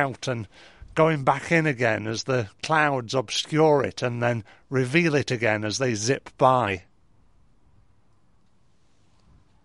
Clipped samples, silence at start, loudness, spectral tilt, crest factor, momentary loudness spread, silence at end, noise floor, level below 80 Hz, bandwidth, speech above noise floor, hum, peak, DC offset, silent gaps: under 0.1%; 0 s; -24 LUFS; -5 dB/octave; 20 dB; 10 LU; 2.85 s; -65 dBFS; -58 dBFS; 11.5 kHz; 41 dB; none; -4 dBFS; 0.1%; none